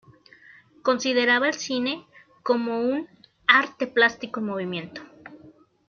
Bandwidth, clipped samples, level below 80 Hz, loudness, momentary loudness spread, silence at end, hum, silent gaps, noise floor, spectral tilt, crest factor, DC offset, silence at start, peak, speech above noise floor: 7 kHz; under 0.1%; -72 dBFS; -23 LUFS; 16 LU; 0.4 s; none; none; -53 dBFS; -3.5 dB/octave; 24 dB; under 0.1%; 0.85 s; -2 dBFS; 29 dB